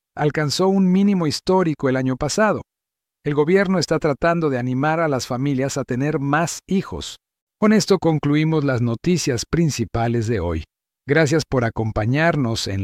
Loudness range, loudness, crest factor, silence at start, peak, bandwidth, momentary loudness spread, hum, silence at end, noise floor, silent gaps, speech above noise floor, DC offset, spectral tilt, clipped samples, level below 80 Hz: 2 LU; -20 LUFS; 14 dB; 0.15 s; -4 dBFS; 15 kHz; 6 LU; none; 0 s; -85 dBFS; 7.42-7.47 s; 66 dB; under 0.1%; -5.5 dB/octave; under 0.1%; -44 dBFS